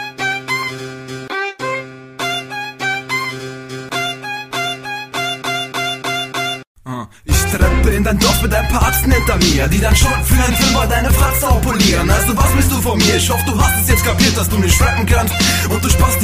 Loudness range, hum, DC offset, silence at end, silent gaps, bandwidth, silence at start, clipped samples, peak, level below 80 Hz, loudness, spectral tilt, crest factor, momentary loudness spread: 8 LU; none; under 0.1%; 0 s; 6.67-6.75 s; 16 kHz; 0 s; under 0.1%; 0 dBFS; -20 dBFS; -15 LUFS; -4 dB/octave; 14 dB; 11 LU